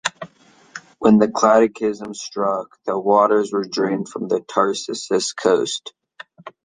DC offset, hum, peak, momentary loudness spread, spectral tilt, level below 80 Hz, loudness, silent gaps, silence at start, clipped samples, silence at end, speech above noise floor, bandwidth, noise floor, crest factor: under 0.1%; none; -2 dBFS; 24 LU; -4.5 dB/octave; -64 dBFS; -19 LUFS; none; 0.05 s; under 0.1%; 0.15 s; 32 dB; 9.8 kHz; -51 dBFS; 18 dB